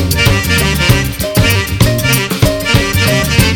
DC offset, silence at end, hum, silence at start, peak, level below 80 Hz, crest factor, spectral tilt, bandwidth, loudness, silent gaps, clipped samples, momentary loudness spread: under 0.1%; 0 s; none; 0 s; 0 dBFS; -22 dBFS; 12 dB; -4.5 dB/octave; 19.5 kHz; -11 LUFS; none; 0.2%; 2 LU